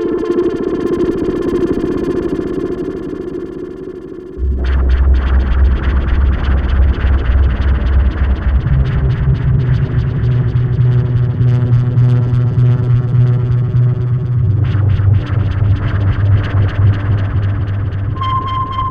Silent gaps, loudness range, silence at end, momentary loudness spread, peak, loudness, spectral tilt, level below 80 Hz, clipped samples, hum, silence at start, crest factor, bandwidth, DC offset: none; 5 LU; 0 s; 7 LU; -2 dBFS; -14 LUFS; -9.5 dB/octave; -18 dBFS; under 0.1%; none; 0 s; 12 dB; 5.2 kHz; under 0.1%